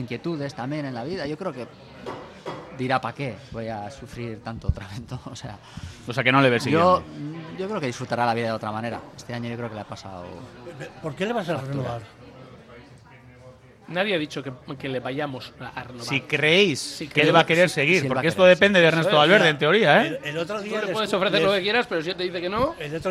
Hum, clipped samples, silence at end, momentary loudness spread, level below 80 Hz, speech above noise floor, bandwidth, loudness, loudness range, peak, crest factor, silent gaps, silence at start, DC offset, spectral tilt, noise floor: none; under 0.1%; 0 s; 20 LU; -48 dBFS; 25 dB; 14 kHz; -22 LUFS; 14 LU; -2 dBFS; 22 dB; none; 0 s; under 0.1%; -5 dB/octave; -48 dBFS